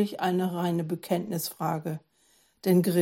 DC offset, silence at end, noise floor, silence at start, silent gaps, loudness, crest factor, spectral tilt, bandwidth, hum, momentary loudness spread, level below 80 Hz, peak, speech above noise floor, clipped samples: under 0.1%; 0 s; -65 dBFS; 0 s; none; -29 LUFS; 16 dB; -6.5 dB/octave; 17 kHz; none; 9 LU; -74 dBFS; -12 dBFS; 38 dB; under 0.1%